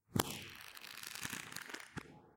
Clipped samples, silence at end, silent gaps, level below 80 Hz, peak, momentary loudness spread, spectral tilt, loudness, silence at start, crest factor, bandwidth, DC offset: under 0.1%; 0 s; none; -66 dBFS; -12 dBFS; 12 LU; -3 dB/octave; -45 LUFS; 0.1 s; 34 dB; 17 kHz; under 0.1%